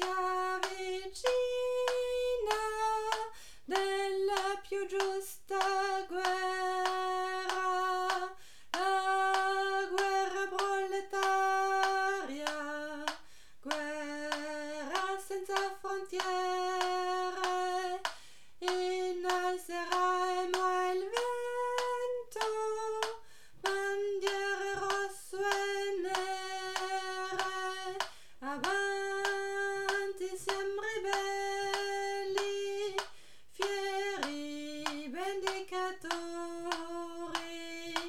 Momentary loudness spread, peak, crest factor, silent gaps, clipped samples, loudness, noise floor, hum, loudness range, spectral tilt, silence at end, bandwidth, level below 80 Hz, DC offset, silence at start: 8 LU; -14 dBFS; 20 dB; none; under 0.1%; -34 LUFS; -59 dBFS; none; 5 LU; -1.5 dB/octave; 0 s; 16.5 kHz; -68 dBFS; 0.3%; 0 s